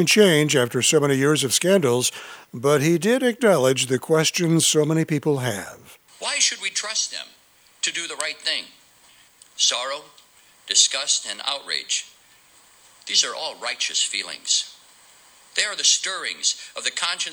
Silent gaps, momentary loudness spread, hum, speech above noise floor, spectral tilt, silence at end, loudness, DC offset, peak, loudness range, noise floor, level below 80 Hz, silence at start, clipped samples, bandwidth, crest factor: none; 10 LU; none; 34 dB; -2.5 dB/octave; 0 s; -20 LUFS; under 0.1%; -2 dBFS; 5 LU; -55 dBFS; -72 dBFS; 0 s; under 0.1%; over 20 kHz; 22 dB